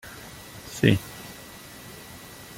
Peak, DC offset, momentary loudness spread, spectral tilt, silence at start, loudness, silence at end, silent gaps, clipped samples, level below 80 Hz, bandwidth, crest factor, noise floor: -2 dBFS; under 0.1%; 20 LU; -5.5 dB/octave; 0.05 s; -24 LUFS; 0.65 s; none; under 0.1%; -54 dBFS; 17 kHz; 26 dB; -44 dBFS